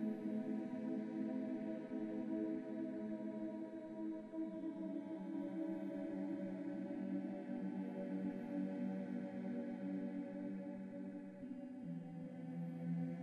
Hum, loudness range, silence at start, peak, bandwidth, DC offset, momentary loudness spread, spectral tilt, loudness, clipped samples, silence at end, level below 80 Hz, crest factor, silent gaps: none; 3 LU; 0 s; -32 dBFS; 8.4 kHz; under 0.1%; 6 LU; -9.5 dB/octave; -45 LUFS; under 0.1%; 0 s; -84 dBFS; 12 dB; none